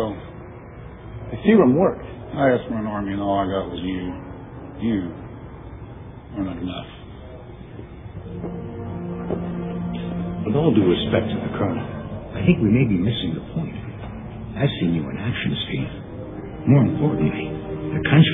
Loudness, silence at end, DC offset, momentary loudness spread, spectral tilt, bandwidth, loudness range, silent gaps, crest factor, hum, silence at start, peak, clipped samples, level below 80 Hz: -22 LUFS; 0 s; under 0.1%; 21 LU; -11 dB/octave; 3.9 kHz; 11 LU; none; 20 dB; none; 0 s; -2 dBFS; under 0.1%; -42 dBFS